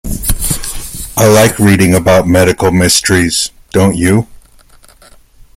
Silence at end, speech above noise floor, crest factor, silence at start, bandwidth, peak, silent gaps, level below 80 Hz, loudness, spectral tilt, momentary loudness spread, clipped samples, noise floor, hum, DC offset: 1.2 s; 33 dB; 10 dB; 0.05 s; 17 kHz; 0 dBFS; none; -28 dBFS; -10 LUFS; -4.5 dB/octave; 10 LU; under 0.1%; -41 dBFS; none; under 0.1%